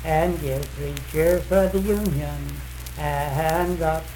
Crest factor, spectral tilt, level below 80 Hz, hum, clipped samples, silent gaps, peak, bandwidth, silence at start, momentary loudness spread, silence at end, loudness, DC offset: 16 dB; -6 dB/octave; -32 dBFS; none; under 0.1%; none; -8 dBFS; 19 kHz; 0 s; 11 LU; 0 s; -24 LUFS; under 0.1%